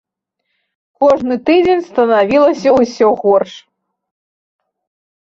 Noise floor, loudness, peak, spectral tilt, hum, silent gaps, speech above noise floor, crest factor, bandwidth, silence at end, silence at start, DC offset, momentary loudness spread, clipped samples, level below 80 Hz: -73 dBFS; -12 LUFS; -2 dBFS; -5.5 dB/octave; none; none; 61 dB; 14 dB; 7.6 kHz; 1.65 s; 1 s; under 0.1%; 4 LU; under 0.1%; -52 dBFS